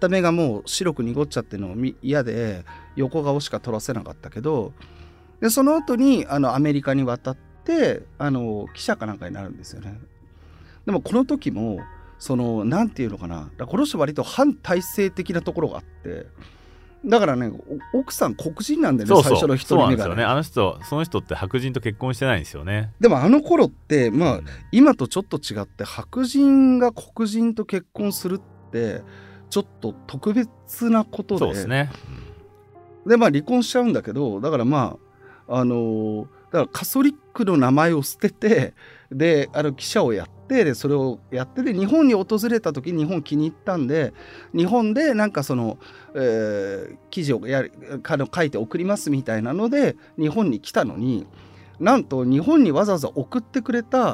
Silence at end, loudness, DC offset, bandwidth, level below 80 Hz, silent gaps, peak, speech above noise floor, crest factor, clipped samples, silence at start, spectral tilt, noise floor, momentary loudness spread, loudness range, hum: 0 s; -21 LUFS; under 0.1%; 16 kHz; -50 dBFS; none; -2 dBFS; 27 dB; 20 dB; under 0.1%; 0 s; -6 dB/octave; -48 dBFS; 13 LU; 6 LU; none